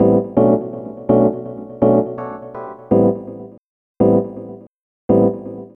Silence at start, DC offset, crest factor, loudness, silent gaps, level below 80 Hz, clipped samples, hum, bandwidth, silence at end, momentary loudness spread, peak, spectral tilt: 0 s; under 0.1%; 18 dB; -16 LUFS; 3.58-3.95 s, 4.67-5.09 s; -48 dBFS; under 0.1%; none; 3.3 kHz; 0.1 s; 17 LU; 0 dBFS; -12 dB/octave